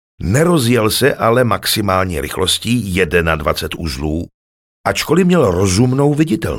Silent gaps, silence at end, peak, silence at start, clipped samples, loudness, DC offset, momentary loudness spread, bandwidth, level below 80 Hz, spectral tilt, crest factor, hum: 4.34-4.84 s; 0 s; 0 dBFS; 0.2 s; under 0.1%; -15 LUFS; under 0.1%; 8 LU; 17 kHz; -34 dBFS; -5 dB/octave; 14 dB; none